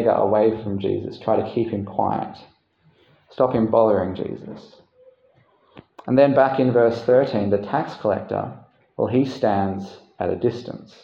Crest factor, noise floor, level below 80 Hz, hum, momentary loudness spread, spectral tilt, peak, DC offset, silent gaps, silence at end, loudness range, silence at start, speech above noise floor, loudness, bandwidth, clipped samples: 18 dB; -59 dBFS; -60 dBFS; none; 17 LU; -8.5 dB/octave; -2 dBFS; under 0.1%; none; 0.2 s; 4 LU; 0 s; 39 dB; -21 LUFS; 7 kHz; under 0.1%